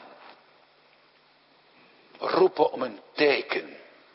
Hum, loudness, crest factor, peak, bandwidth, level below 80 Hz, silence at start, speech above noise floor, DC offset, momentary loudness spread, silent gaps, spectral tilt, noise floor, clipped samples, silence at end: none; -25 LUFS; 22 dB; -8 dBFS; 5.8 kHz; -80 dBFS; 2.2 s; 36 dB; under 0.1%; 14 LU; none; -8 dB/octave; -61 dBFS; under 0.1%; 0.4 s